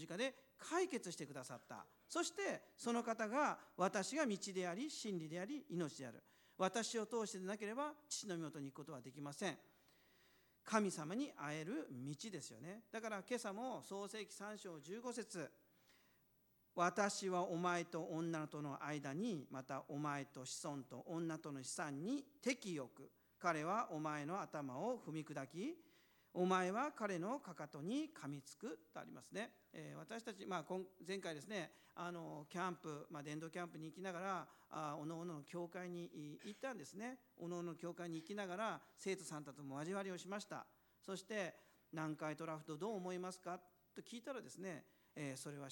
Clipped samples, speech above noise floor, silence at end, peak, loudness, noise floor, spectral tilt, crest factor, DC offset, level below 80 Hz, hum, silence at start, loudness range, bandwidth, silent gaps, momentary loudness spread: under 0.1%; 31 dB; 0 s; -20 dBFS; -46 LUFS; -78 dBFS; -4.5 dB/octave; 26 dB; under 0.1%; under -90 dBFS; none; 0 s; 7 LU; 19 kHz; none; 12 LU